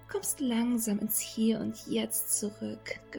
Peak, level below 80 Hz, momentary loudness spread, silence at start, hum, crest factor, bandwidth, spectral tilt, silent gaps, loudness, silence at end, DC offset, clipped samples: -16 dBFS; -64 dBFS; 9 LU; 0 s; none; 16 dB; 19.5 kHz; -3.5 dB/octave; none; -31 LUFS; 0 s; under 0.1%; under 0.1%